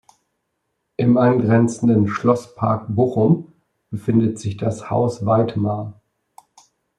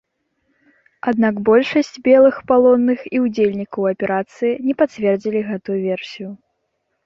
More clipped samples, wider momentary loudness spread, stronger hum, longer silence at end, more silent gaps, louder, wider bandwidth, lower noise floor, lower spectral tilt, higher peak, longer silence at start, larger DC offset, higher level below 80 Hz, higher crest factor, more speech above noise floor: neither; about the same, 10 LU vs 11 LU; neither; first, 1.05 s vs 0.7 s; neither; about the same, -19 LUFS vs -17 LUFS; first, 10.5 kHz vs 7.4 kHz; about the same, -74 dBFS vs -71 dBFS; first, -8.5 dB/octave vs -7 dB/octave; about the same, -4 dBFS vs -2 dBFS; about the same, 1 s vs 1.05 s; neither; about the same, -58 dBFS vs -60 dBFS; about the same, 16 dB vs 16 dB; about the same, 56 dB vs 55 dB